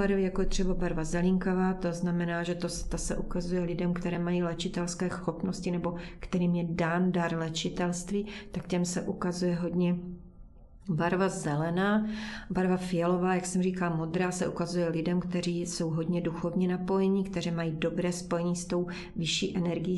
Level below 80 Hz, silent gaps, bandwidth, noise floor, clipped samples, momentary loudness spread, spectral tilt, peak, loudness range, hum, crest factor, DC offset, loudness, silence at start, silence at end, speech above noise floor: -46 dBFS; none; 12 kHz; -50 dBFS; under 0.1%; 6 LU; -6 dB/octave; -14 dBFS; 3 LU; none; 16 dB; under 0.1%; -31 LUFS; 0 s; 0 s; 21 dB